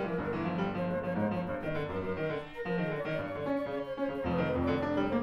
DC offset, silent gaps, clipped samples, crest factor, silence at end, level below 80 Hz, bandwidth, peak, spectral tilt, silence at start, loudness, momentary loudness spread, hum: under 0.1%; none; under 0.1%; 16 dB; 0 s; -54 dBFS; 12 kHz; -18 dBFS; -8.5 dB/octave; 0 s; -34 LUFS; 5 LU; none